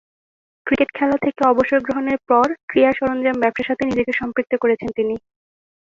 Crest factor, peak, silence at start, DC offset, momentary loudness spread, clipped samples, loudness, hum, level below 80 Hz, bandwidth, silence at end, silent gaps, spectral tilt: 18 dB; -2 dBFS; 0.65 s; under 0.1%; 6 LU; under 0.1%; -19 LUFS; none; -52 dBFS; 7.4 kHz; 0.75 s; 2.63-2.68 s; -6.5 dB/octave